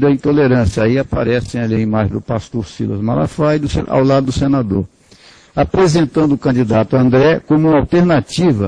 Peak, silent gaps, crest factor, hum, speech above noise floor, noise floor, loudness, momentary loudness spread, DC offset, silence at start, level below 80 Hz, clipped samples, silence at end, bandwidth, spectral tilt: 0 dBFS; none; 14 dB; none; 31 dB; -44 dBFS; -14 LUFS; 9 LU; under 0.1%; 0 s; -34 dBFS; under 0.1%; 0 s; 10.5 kHz; -7.5 dB/octave